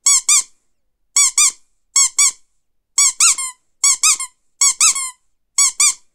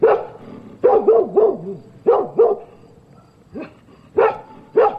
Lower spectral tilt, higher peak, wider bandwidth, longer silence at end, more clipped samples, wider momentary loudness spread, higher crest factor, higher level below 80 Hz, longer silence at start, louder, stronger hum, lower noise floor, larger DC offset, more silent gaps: second, 7 dB/octave vs -8.5 dB/octave; about the same, 0 dBFS vs -2 dBFS; first, 18 kHz vs 5 kHz; first, 0.2 s vs 0 s; neither; second, 11 LU vs 21 LU; about the same, 16 dB vs 16 dB; second, -64 dBFS vs -58 dBFS; about the same, 0.05 s vs 0 s; first, -13 LUFS vs -17 LUFS; neither; first, -65 dBFS vs -48 dBFS; neither; neither